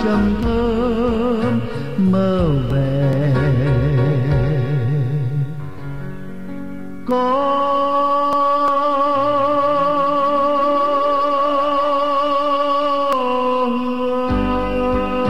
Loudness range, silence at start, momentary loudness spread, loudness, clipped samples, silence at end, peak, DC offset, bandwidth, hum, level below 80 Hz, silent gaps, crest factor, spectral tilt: 4 LU; 0 s; 8 LU; -17 LUFS; under 0.1%; 0 s; -6 dBFS; 3%; 10.5 kHz; none; -34 dBFS; none; 12 dB; -8.5 dB/octave